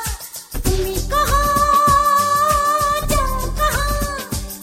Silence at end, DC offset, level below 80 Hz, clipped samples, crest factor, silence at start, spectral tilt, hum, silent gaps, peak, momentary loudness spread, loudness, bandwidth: 0 s; under 0.1%; -26 dBFS; under 0.1%; 14 dB; 0 s; -3.5 dB/octave; none; none; -4 dBFS; 12 LU; -17 LUFS; 16.5 kHz